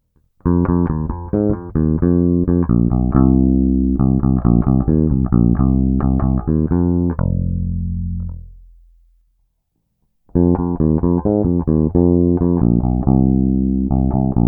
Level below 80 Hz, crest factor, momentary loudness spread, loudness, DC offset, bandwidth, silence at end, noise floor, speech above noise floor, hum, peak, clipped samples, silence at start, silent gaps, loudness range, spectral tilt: -24 dBFS; 16 dB; 7 LU; -16 LUFS; under 0.1%; 2 kHz; 0 s; -69 dBFS; 54 dB; none; 0 dBFS; under 0.1%; 0.45 s; none; 7 LU; -16 dB/octave